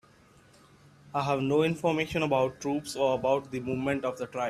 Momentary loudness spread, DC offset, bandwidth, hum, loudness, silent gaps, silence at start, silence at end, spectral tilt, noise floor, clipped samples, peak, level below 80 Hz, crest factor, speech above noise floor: 7 LU; under 0.1%; 14 kHz; none; -29 LUFS; none; 1.05 s; 0 s; -6 dB/octave; -59 dBFS; under 0.1%; -12 dBFS; -60 dBFS; 18 dB; 30 dB